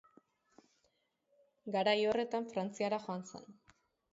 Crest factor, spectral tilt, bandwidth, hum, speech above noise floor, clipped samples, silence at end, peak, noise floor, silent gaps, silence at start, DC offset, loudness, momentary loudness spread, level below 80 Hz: 20 dB; -3 dB/octave; 7.6 kHz; none; 43 dB; under 0.1%; 0.6 s; -18 dBFS; -79 dBFS; none; 1.65 s; under 0.1%; -36 LUFS; 20 LU; -80 dBFS